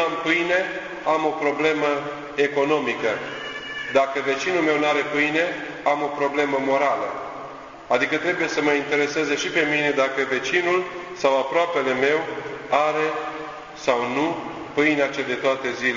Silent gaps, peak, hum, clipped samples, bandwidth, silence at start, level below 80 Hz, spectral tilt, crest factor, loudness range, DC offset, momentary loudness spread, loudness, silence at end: none; -4 dBFS; none; under 0.1%; 7.6 kHz; 0 s; -62 dBFS; -4 dB/octave; 20 dB; 2 LU; under 0.1%; 10 LU; -22 LUFS; 0 s